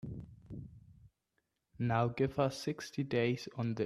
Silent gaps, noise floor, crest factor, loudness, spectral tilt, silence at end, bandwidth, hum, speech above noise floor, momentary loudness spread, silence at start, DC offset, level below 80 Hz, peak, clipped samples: none; -83 dBFS; 20 dB; -35 LUFS; -6.5 dB/octave; 0 s; 13.5 kHz; none; 49 dB; 17 LU; 0.05 s; under 0.1%; -64 dBFS; -18 dBFS; under 0.1%